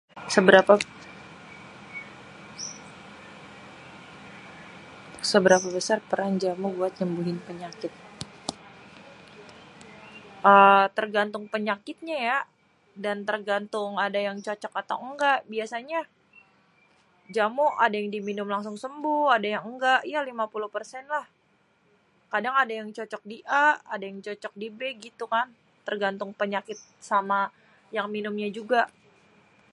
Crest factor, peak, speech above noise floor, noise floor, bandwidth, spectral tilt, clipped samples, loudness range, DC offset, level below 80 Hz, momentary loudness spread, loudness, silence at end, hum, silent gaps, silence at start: 26 dB; -2 dBFS; 41 dB; -66 dBFS; 11.5 kHz; -4 dB/octave; under 0.1%; 9 LU; under 0.1%; -72 dBFS; 23 LU; -25 LUFS; 0.85 s; none; none; 0.15 s